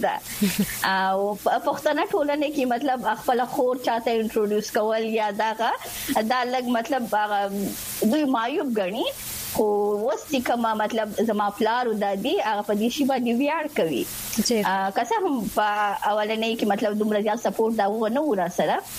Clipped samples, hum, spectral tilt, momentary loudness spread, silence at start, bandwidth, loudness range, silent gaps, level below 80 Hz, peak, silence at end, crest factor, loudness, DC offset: under 0.1%; none; -4 dB/octave; 3 LU; 0 s; 15.5 kHz; 1 LU; none; -56 dBFS; -8 dBFS; 0 s; 16 dB; -24 LUFS; under 0.1%